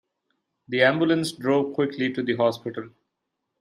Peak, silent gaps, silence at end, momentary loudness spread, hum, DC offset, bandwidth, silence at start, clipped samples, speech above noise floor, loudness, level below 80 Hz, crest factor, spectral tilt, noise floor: -6 dBFS; none; 0.75 s; 12 LU; none; under 0.1%; 14 kHz; 0.7 s; under 0.1%; 57 dB; -23 LUFS; -70 dBFS; 20 dB; -5.5 dB/octave; -81 dBFS